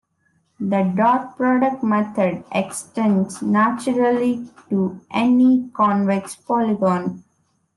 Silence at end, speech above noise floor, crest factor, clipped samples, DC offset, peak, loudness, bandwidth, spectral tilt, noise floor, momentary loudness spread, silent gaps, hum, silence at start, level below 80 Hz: 0.55 s; 46 dB; 16 dB; under 0.1%; under 0.1%; -4 dBFS; -20 LUFS; 12 kHz; -6.5 dB/octave; -65 dBFS; 7 LU; none; none; 0.6 s; -64 dBFS